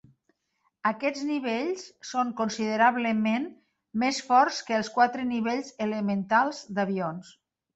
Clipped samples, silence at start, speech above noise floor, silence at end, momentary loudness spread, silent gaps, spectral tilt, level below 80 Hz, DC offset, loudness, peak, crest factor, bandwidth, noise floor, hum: under 0.1%; 0.85 s; 48 dB; 0.45 s; 10 LU; none; -4.5 dB/octave; -72 dBFS; under 0.1%; -27 LUFS; -8 dBFS; 20 dB; 8.2 kHz; -75 dBFS; none